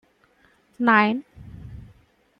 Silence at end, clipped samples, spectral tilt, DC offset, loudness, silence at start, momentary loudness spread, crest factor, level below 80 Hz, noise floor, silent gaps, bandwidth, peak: 0.6 s; under 0.1%; -7.5 dB/octave; under 0.1%; -20 LUFS; 0.8 s; 25 LU; 22 dB; -52 dBFS; -61 dBFS; none; 5.6 kHz; -4 dBFS